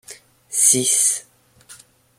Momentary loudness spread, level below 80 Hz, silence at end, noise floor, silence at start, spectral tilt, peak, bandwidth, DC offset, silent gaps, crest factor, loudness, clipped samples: 12 LU; -68 dBFS; 0.45 s; -48 dBFS; 0.1 s; -1 dB/octave; -2 dBFS; 16.5 kHz; under 0.1%; none; 20 dB; -15 LUFS; under 0.1%